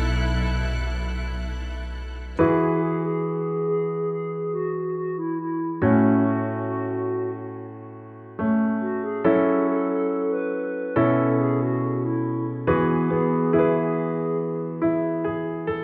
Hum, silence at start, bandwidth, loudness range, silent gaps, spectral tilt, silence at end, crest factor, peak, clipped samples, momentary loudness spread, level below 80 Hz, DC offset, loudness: none; 0 s; 7.8 kHz; 3 LU; none; -9 dB/octave; 0 s; 18 dB; -4 dBFS; under 0.1%; 11 LU; -34 dBFS; under 0.1%; -24 LUFS